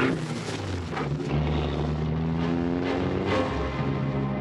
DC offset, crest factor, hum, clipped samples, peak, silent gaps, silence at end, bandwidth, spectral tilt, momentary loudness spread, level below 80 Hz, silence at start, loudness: under 0.1%; 16 dB; none; under 0.1%; -12 dBFS; none; 0 s; 11 kHz; -7 dB/octave; 5 LU; -40 dBFS; 0 s; -28 LUFS